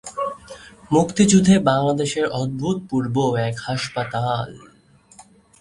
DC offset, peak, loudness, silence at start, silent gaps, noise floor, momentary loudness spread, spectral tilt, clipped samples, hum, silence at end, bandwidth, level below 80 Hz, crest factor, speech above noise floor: under 0.1%; -4 dBFS; -20 LUFS; 0.05 s; none; -49 dBFS; 14 LU; -5.5 dB/octave; under 0.1%; none; 1.05 s; 11.5 kHz; -50 dBFS; 18 dB; 30 dB